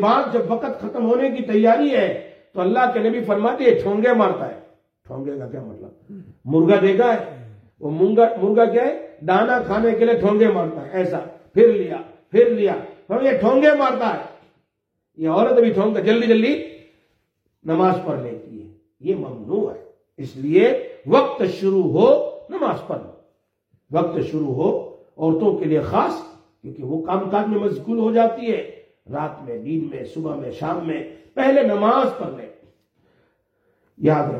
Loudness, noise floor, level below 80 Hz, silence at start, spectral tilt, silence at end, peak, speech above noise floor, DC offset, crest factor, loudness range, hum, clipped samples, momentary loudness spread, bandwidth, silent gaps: -19 LUFS; -75 dBFS; -60 dBFS; 0 s; -8 dB/octave; 0 s; -2 dBFS; 57 dB; under 0.1%; 18 dB; 5 LU; none; under 0.1%; 16 LU; 6.6 kHz; none